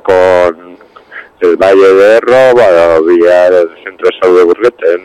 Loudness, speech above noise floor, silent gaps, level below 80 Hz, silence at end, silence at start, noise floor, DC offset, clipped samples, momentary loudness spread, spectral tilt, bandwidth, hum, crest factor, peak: -7 LUFS; 28 dB; none; -46 dBFS; 0.05 s; 0.05 s; -34 dBFS; under 0.1%; under 0.1%; 8 LU; -5.5 dB/octave; 11.5 kHz; none; 6 dB; 0 dBFS